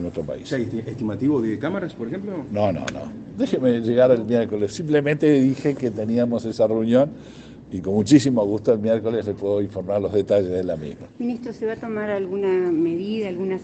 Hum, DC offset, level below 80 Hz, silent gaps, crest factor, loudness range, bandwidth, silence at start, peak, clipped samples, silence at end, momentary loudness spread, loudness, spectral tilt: none; under 0.1%; -56 dBFS; none; 20 dB; 4 LU; 8.8 kHz; 0 s; -2 dBFS; under 0.1%; 0 s; 12 LU; -22 LUFS; -7 dB/octave